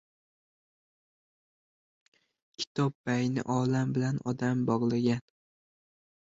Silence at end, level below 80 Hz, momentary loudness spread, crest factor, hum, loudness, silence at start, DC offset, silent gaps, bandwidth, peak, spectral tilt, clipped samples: 1.1 s; -68 dBFS; 4 LU; 18 dB; none; -30 LUFS; 2.6 s; under 0.1%; 2.67-2.75 s, 2.95-3.04 s; 7.8 kHz; -14 dBFS; -6.5 dB/octave; under 0.1%